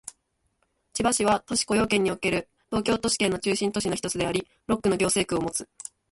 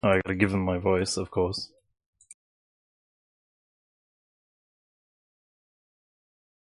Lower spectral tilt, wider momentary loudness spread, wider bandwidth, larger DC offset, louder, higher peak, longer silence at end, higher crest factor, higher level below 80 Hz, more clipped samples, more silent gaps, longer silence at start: second, -3.5 dB/octave vs -5.5 dB/octave; about the same, 8 LU vs 8 LU; about the same, 12 kHz vs 11.5 kHz; neither; about the same, -25 LUFS vs -27 LUFS; second, -10 dBFS vs -6 dBFS; second, 0.45 s vs 4.95 s; second, 16 dB vs 26 dB; about the same, -52 dBFS vs -50 dBFS; neither; neither; about the same, 0.05 s vs 0.05 s